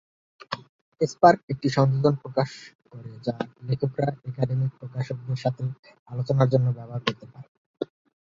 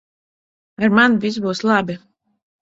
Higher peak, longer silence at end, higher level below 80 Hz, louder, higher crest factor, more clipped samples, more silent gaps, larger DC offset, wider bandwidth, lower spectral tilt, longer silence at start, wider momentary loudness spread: about the same, -2 dBFS vs 0 dBFS; second, 0.45 s vs 0.65 s; about the same, -62 dBFS vs -58 dBFS; second, -25 LUFS vs -17 LUFS; about the same, 24 dB vs 20 dB; neither; first, 0.69-0.92 s, 1.43-1.48 s, 2.75-2.79 s, 5.79-5.83 s, 5.99-6.06 s, 7.48-7.74 s vs none; neither; about the same, 7.6 kHz vs 7.8 kHz; first, -7.5 dB/octave vs -5.5 dB/octave; second, 0.5 s vs 0.8 s; first, 16 LU vs 12 LU